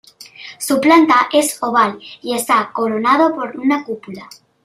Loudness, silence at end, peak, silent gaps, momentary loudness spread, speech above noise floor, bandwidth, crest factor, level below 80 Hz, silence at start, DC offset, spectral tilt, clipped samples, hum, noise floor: -15 LUFS; 0.4 s; 0 dBFS; none; 18 LU; 22 dB; 15.5 kHz; 16 dB; -62 dBFS; 0.2 s; under 0.1%; -3 dB/octave; under 0.1%; none; -37 dBFS